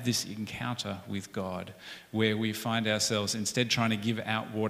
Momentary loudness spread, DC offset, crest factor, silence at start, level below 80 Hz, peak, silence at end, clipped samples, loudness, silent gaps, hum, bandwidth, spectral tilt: 10 LU; under 0.1%; 18 dB; 0 s; -66 dBFS; -12 dBFS; 0 s; under 0.1%; -31 LUFS; none; none; 16 kHz; -4 dB/octave